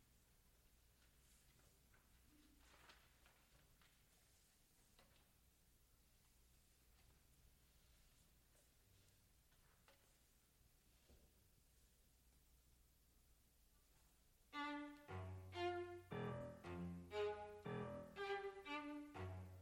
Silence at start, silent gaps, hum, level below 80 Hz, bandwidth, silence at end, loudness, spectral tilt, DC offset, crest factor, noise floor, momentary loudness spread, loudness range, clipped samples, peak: 0 s; none; none; -76 dBFS; 16.5 kHz; 0 s; -52 LUFS; -6 dB/octave; under 0.1%; 22 dB; -76 dBFS; 8 LU; 8 LU; under 0.1%; -36 dBFS